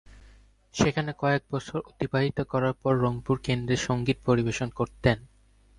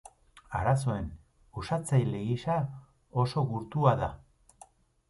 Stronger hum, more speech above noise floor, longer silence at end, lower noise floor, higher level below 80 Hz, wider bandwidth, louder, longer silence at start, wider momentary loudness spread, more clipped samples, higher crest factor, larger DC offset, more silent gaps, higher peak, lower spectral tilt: neither; about the same, 29 dB vs 29 dB; second, 0.55 s vs 0.9 s; about the same, -55 dBFS vs -58 dBFS; about the same, -48 dBFS vs -50 dBFS; about the same, 11 kHz vs 11.5 kHz; first, -27 LUFS vs -30 LUFS; second, 0.1 s vs 0.5 s; second, 7 LU vs 13 LU; neither; about the same, 20 dB vs 20 dB; neither; neither; first, -8 dBFS vs -12 dBFS; about the same, -6 dB/octave vs -7 dB/octave